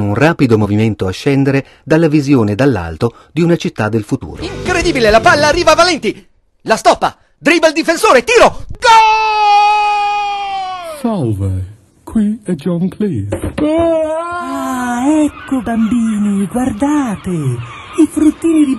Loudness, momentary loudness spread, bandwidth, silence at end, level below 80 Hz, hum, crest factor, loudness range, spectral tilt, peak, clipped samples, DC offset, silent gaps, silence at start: -13 LUFS; 11 LU; 12.5 kHz; 0 s; -36 dBFS; none; 12 dB; 7 LU; -5.5 dB/octave; 0 dBFS; under 0.1%; under 0.1%; none; 0 s